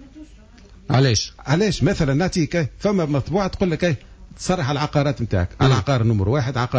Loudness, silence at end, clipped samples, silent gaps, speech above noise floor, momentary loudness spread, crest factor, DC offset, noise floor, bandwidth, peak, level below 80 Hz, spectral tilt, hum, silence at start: -20 LUFS; 0 s; under 0.1%; none; 26 dB; 5 LU; 14 dB; under 0.1%; -45 dBFS; 8 kHz; -6 dBFS; -36 dBFS; -6 dB/octave; none; 0 s